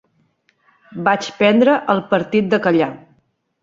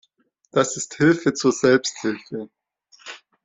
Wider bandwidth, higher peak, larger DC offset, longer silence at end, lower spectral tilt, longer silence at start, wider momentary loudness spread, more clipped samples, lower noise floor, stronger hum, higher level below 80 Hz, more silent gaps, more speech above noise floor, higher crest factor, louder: about the same, 7.6 kHz vs 8.2 kHz; about the same, -2 dBFS vs -4 dBFS; neither; first, 0.65 s vs 0.3 s; first, -6 dB/octave vs -4.5 dB/octave; first, 0.9 s vs 0.55 s; second, 8 LU vs 21 LU; neither; about the same, -62 dBFS vs -65 dBFS; neither; about the same, -60 dBFS vs -62 dBFS; neither; about the same, 46 dB vs 45 dB; about the same, 16 dB vs 18 dB; first, -16 LUFS vs -21 LUFS